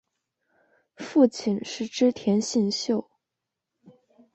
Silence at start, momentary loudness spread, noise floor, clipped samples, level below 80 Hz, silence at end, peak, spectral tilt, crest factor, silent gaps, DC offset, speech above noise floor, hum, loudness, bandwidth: 1 s; 8 LU; -85 dBFS; under 0.1%; -70 dBFS; 1.35 s; -8 dBFS; -5 dB/octave; 20 dB; none; under 0.1%; 61 dB; none; -25 LUFS; 8.4 kHz